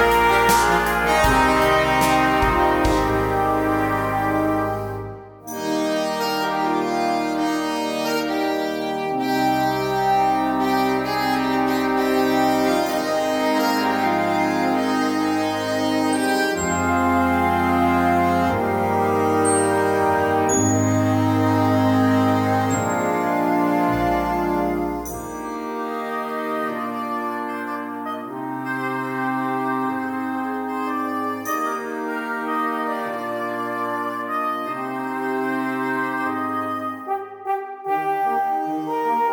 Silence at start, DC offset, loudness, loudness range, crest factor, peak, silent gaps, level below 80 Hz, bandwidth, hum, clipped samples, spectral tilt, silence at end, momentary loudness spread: 0 s; under 0.1%; -21 LUFS; 7 LU; 16 dB; -4 dBFS; none; -40 dBFS; 18 kHz; none; under 0.1%; -5 dB/octave; 0 s; 9 LU